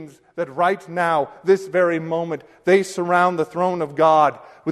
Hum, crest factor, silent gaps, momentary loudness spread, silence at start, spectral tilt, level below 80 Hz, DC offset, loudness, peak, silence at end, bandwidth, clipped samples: none; 16 dB; none; 11 LU; 0 s; -6 dB/octave; -66 dBFS; under 0.1%; -20 LUFS; -4 dBFS; 0 s; 13 kHz; under 0.1%